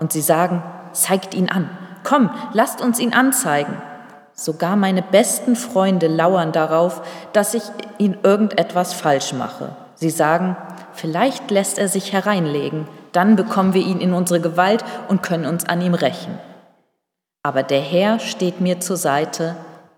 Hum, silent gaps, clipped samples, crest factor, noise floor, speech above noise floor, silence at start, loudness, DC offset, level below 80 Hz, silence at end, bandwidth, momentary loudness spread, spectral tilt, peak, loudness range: none; none; under 0.1%; 18 dB; -78 dBFS; 60 dB; 0 s; -18 LUFS; under 0.1%; -76 dBFS; 0.2 s; 18.5 kHz; 12 LU; -4.5 dB/octave; 0 dBFS; 3 LU